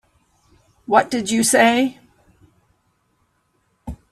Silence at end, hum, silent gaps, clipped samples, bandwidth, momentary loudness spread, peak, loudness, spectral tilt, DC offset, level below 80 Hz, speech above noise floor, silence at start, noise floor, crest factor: 0.15 s; none; none; under 0.1%; 15 kHz; 24 LU; 0 dBFS; -17 LUFS; -3 dB/octave; under 0.1%; -50 dBFS; 50 dB; 0.9 s; -66 dBFS; 22 dB